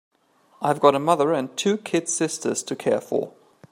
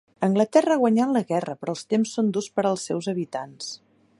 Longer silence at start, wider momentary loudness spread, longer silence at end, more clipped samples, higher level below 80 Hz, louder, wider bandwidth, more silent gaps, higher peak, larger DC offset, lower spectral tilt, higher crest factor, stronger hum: first, 0.6 s vs 0.2 s; second, 9 LU vs 13 LU; about the same, 0.4 s vs 0.45 s; neither; about the same, -72 dBFS vs -74 dBFS; about the same, -23 LUFS vs -24 LUFS; first, 16 kHz vs 11.5 kHz; neither; about the same, -2 dBFS vs -4 dBFS; neither; second, -4 dB/octave vs -5.5 dB/octave; about the same, 20 dB vs 20 dB; neither